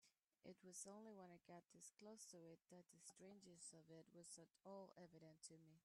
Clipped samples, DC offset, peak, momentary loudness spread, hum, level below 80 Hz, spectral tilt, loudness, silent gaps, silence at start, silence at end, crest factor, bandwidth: under 0.1%; under 0.1%; -44 dBFS; 8 LU; none; under -90 dBFS; -3.5 dB/octave; -63 LUFS; none; 0 s; 0.05 s; 20 dB; 13 kHz